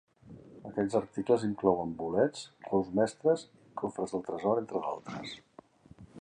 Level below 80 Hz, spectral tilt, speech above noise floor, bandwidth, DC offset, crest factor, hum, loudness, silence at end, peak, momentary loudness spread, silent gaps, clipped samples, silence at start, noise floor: -66 dBFS; -6.5 dB/octave; 25 dB; 10 kHz; under 0.1%; 22 dB; none; -32 LUFS; 0 s; -10 dBFS; 15 LU; none; under 0.1%; 0.25 s; -56 dBFS